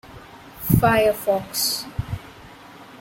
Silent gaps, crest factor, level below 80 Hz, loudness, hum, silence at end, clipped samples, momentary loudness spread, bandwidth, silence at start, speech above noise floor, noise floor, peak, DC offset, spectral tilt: none; 22 dB; -42 dBFS; -21 LUFS; none; 0.05 s; under 0.1%; 25 LU; 16.5 kHz; 0.05 s; 24 dB; -43 dBFS; -2 dBFS; under 0.1%; -4.5 dB/octave